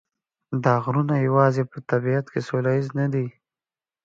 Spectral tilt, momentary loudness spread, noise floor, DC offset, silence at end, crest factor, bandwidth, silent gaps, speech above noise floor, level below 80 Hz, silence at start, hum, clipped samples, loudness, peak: -9 dB/octave; 8 LU; under -90 dBFS; under 0.1%; 0.75 s; 18 dB; 7.4 kHz; none; over 68 dB; -66 dBFS; 0.5 s; none; under 0.1%; -23 LUFS; -4 dBFS